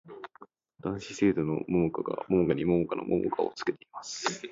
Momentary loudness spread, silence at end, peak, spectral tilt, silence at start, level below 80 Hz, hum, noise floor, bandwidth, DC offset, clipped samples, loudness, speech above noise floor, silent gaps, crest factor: 13 LU; 0 s; -12 dBFS; -6 dB/octave; 0.05 s; -58 dBFS; none; -56 dBFS; 7.8 kHz; under 0.1%; under 0.1%; -30 LUFS; 27 dB; none; 18 dB